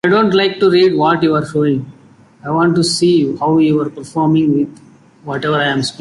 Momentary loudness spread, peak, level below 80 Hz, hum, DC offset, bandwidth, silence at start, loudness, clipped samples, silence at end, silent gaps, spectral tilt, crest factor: 10 LU; -2 dBFS; -52 dBFS; none; under 0.1%; 11.5 kHz; 0.05 s; -14 LUFS; under 0.1%; 0.1 s; none; -5.5 dB/octave; 12 dB